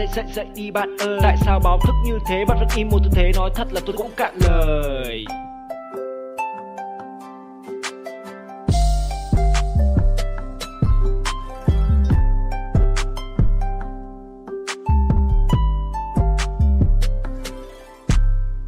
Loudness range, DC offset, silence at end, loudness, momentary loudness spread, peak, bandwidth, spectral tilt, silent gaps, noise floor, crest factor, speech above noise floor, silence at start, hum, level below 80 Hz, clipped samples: 7 LU; under 0.1%; 0 s; -21 LUFS; 16 LU; -4 dBFS; 15.5 kHz; -6.5 dB/octave; none; -38 dBFS; 14 dB; 21 dB; 0 s; none; -20 dBFS; under 0.1%